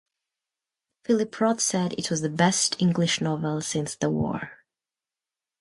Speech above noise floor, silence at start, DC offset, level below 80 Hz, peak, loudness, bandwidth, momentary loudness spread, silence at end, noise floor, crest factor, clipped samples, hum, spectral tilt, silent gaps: over 65 dB; 1.1 s; under 0.1%; -60 dBFS; -8 dBFS; -25 LUFS; 11.5 kHz; 7 LU; 1.05 s; under -90 dBFS; 18 dB; under 0.1%; none; -4 dB/octave; none